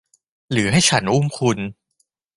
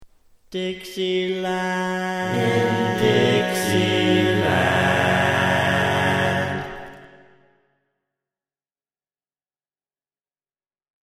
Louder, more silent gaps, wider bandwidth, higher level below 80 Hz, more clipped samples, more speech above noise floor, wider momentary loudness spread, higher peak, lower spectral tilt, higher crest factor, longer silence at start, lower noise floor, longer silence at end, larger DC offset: about the same, -18 LUFS vs -20 LUFS; neither; second, 11.5 kHz vs 15.5 kHz; first, -48 dBFS vs -54 dBFS; neither; second, 51 dB vs over 69 dB; about the same, 10 LU vs 10 LU; about the same, -2 dBFS vs -4 dBFS; about the same, -4 dB/octave vs -5 dB/octave; about the same, 18 dB vs 18 dB; first, 0.5 s vs 0 s; second, -69 dBFS vs under -90 dBFS; second, 0.65 s vs 4 s; neither